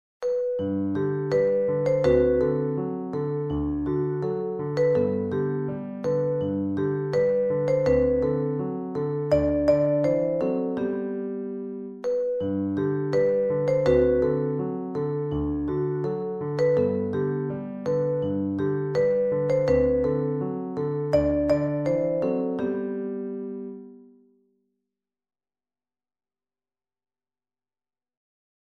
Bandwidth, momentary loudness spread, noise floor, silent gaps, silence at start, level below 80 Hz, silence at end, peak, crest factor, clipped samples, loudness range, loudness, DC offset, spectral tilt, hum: 7.2 kHz; 8 LU; under -90 dBFS; none; 0.2 s; -46 dBFS; 4.65 s; -8 dBFS; 18 dB; under 0.1%; 3 LU; -25 LUFS; under 0.1%; -9 dB/octave; none